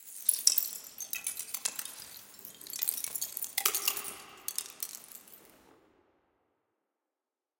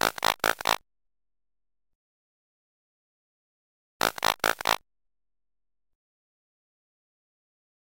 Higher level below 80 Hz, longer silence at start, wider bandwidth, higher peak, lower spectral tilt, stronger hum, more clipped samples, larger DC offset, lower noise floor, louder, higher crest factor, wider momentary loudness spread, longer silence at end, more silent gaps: second, -80 dBFS vs -60 dBFS; about the same, 0 s vs 0.05 s; about the same, 17 kHz vs 17 kHz; about the same, -4 dBFS vs -6 dBFS; second, 2.5 dB/octave vs -1 dB/octave; neither; neither; neither; about the same, under -90 dBFS vs under -90 dBFS; second, -32 LUFS vs -27 LUFS; about the same, 32 dB vs 28 dB; first, 20 LU vs 4 LU; second, 2.1 s vs 3.25 s; second, none vs 1.95-4.00 s